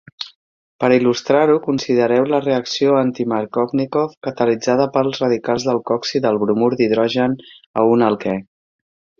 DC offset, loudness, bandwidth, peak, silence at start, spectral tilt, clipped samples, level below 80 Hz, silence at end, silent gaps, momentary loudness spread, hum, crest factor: under 0.1%; -17 LUFS; 7.4 kHz; -2 dBFS; 0.2 s; -6 dB/octave; under 0.1%; -58 dBFS; 0.75 s; 0.35-0.79 s, 4.17-4.21 s, 7.66-7.74 s; 7 LU; none; 16 dB